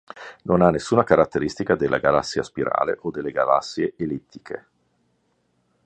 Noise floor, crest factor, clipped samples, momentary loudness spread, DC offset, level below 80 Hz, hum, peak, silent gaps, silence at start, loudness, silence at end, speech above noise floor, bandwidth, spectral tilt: -68 dBFS; 22 dB; under 0.1%; 17 LU; under 0.1%; -50 dBFS; none; -2 dBFS; none; 0.15 s; -21 LUFS; 1.25 s; 47 dB; 9.2 kHz; -6 dB/octave